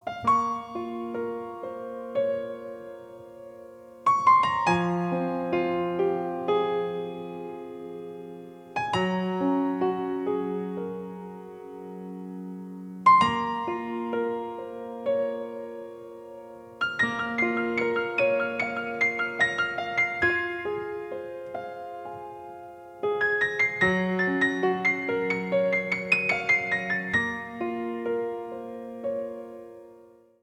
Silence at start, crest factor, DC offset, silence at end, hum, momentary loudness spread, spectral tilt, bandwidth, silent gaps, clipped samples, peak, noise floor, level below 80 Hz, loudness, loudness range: 0.05 s; 20 dB; under 0.1%; 0.35 s; none; 18 LU; -6 dB/octave; 12 kHz; none; under 0.1%; -8 dBFS; -54 dBFS; -64 dBFS; -26 LUFS; 7 LU